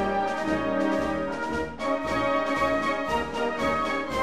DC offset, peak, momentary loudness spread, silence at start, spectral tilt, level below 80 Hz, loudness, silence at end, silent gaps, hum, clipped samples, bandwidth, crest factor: 0.5%; -12 dBFS; 5 LU; 0 s; -5 dB/octave; -46 dBFS; -26 LUFS; 0 s; none; none; under 0.1%; 15 kHz; 16 dB